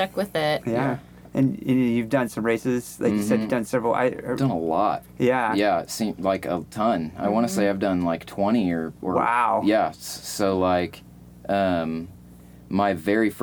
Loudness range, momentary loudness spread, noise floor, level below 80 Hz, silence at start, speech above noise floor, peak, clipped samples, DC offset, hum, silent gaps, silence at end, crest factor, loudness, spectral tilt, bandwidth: 1 LU; 7 LU; -46 dBFS; -56 dBFS; 0 s; 23 dB; -8 dBFS; under 0.1%; under 0.1%; 60 Hz at -50 dBFS; none; 0 s; 16 dB; -24 LUFS; -6 dB/octave; over 20 kHz